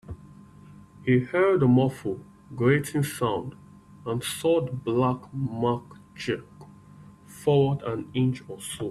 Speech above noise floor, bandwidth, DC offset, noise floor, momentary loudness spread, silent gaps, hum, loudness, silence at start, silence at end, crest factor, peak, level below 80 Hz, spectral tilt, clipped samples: 25 dB; 14 kHz; under 0.1%; -49 dBFS; 14 LU; none; none; -26 LUFS; 0.1 s; 0 s; 18 dB; -8 dBFS; -58 dBFS; -6.5 dB/octave; under 0.1%